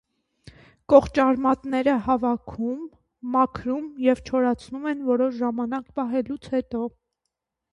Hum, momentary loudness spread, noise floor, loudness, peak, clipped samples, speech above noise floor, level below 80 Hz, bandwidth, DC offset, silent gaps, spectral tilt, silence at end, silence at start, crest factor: none; 11 LU; -82 dBFS; -24 LUFS; -2 dBFS; under 0.1%; 59 dB; -52 dBFS; 10.5 kHz; under 0.1%; none; -7 dB/octave; 0.85 s; 0.9 s; 22 dB